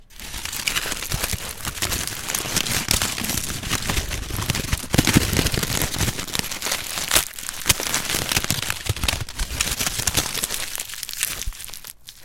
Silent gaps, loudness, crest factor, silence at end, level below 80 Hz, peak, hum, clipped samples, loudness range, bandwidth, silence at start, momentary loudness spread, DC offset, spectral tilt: none; -23 LUFS; 24 dB; 0 s; -34 dBFS; 0 dBFS; none; under 0.1%; 2 LU; 17 kHz; 0 s; 9 LU; under 0.1%; -2.5 dB/octave